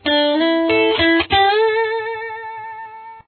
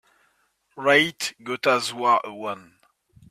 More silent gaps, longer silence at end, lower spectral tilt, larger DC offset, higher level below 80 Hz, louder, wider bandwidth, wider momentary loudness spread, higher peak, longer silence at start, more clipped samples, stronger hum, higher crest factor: neither; second, 0.05 s vs 0.7 s; first, -7 dB/octave vs -3 dB/octave; neither; first, -46 dBFS vs -70 dBFS; first, -16 LUFS vs -22 LUFS; second, 4.6 kHz vs 15.5 kHz; about the same, 17 LU vs 15 LU; about the same, -4 dBFS vs -4 dBFS; second, 0.05 s vs 0.75 s; neither; neither; second, 14 dB vs 20 dB